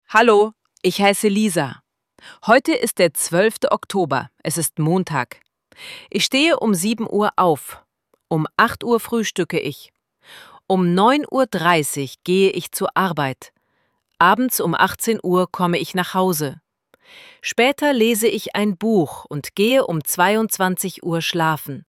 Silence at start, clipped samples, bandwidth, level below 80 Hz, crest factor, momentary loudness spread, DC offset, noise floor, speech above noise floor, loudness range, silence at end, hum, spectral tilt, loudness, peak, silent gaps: 0.1 s; under 0.1%; 17 kHz; -60 dBFS; 18 dB; 9 LU; under 0.1%; -68 dBFS; 49 dB; 2 LU; 0.1 s; none; -4 dB/octave; -19 LUFS; 0 dBFS; none